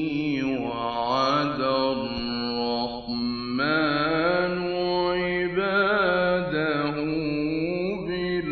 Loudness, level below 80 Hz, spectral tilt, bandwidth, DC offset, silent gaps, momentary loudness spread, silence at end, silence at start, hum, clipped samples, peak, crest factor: -25 LUFS; -50 dBFS; -6.5 dB/octave; 6.4 kHz; under 0.1%; none; 6 LU; 0 s; 0 s; 50 Hz at -55 dBFS; under 0.1%; -8 dBFS; 16 dB